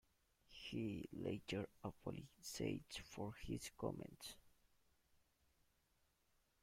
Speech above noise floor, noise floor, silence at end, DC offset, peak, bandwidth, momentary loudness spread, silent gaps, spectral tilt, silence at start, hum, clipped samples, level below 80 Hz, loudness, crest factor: 33 dB; -82 dBFS; 2.15 s; under 0.1%; -30 dBFS; 16.5 kHz; 9 LU; none; -5 dB/octave; 0.5 s; none; under 0.1%; -70 dBFS; -50 LUFS; 22 dB